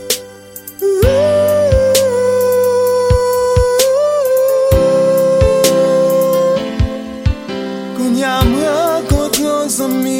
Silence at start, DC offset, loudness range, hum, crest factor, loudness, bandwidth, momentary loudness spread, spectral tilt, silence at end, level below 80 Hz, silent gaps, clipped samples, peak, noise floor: 0 s; under 0.1%; 4 LU; none; 12 dB; -13 LUFS; 16.5 kHz; 8 LU; -5 dB/octave; 0 s; -24 dBFS; none; under 0.1%; 0 dBFS; -33 dBFS